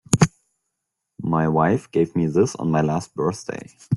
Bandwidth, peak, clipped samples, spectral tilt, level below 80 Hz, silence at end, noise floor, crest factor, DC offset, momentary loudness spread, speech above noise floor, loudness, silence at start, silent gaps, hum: 12 kHz; 0 dBFS; under 0.1%; -6.5 dB/octave; -50 dBFS; 0 s; -80 dBFS; 22 dB; under 0.1%; 12 LU; 59 dB; -21 LUFS; 0.1 s; none; none